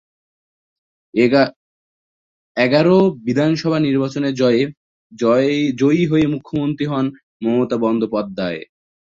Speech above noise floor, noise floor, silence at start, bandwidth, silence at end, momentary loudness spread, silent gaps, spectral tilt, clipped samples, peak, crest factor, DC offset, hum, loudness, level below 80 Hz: over 74 dB; under -90 dBFS; 1.15 s; 7.6 kHz; 0.55 s; 10 LU; 1.56-2.55 s, 4.77-5.10 s, 7.23-7.40 s; -7 dB/octave; under 0.1%; -2 dBFS; 16 dB; under 0.1%; none; -17 LUFS; -56 dBFS